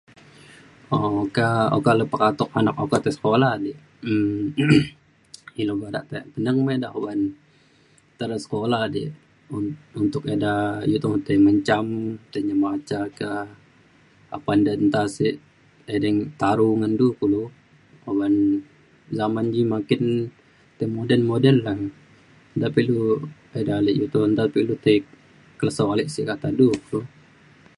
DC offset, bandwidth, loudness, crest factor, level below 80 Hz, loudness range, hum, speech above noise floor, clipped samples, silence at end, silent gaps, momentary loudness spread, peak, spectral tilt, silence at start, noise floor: under 0.1%; 11.5 kHz; -22 LUFS; 20 dB; -56 dBFS; 5 LU; none; 36 dB; under 0.1%; 0.7 s; none; 11 LU; -2 dBFS; -7 dB/octave; 0.9 s; -57 dBFS